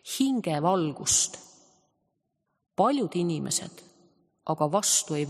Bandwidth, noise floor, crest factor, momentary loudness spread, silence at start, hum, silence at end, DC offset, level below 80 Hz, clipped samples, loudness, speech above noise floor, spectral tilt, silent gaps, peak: 14 kHz; -78 dBFS; 20 dB; 14 LU; 0.05 s; none; 0 s; under 0.1%; -64 dBFS; under 0.1%; -26 LUFS; 52 dB; -3.5 dB/octave; none; -8 dBFS